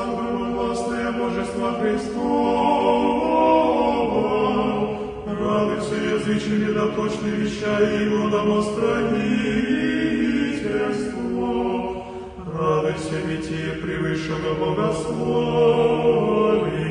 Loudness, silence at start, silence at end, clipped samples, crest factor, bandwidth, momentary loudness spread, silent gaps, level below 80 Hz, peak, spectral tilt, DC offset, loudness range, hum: -22 LUFS; 0 s; 0 s; under 0.1%; 16 dB; 10 kHz; 8 LU; none; -46 dBFS; -4 dBFS; -6.5 dB/octave; under 0.1%; 5 LU; none